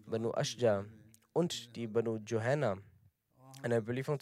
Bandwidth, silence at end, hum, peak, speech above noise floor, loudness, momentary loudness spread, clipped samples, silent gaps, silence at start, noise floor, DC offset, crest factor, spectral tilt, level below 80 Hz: 15.5 kHz; 0 s; none; -18 dBFS; 33 dB; -35 LUFS; 8 LU; under 0.1%; none; 0.05 s; -68 dBFS; under 0.1%; 18 dB; -5.5 dB/octave; -80 dBFS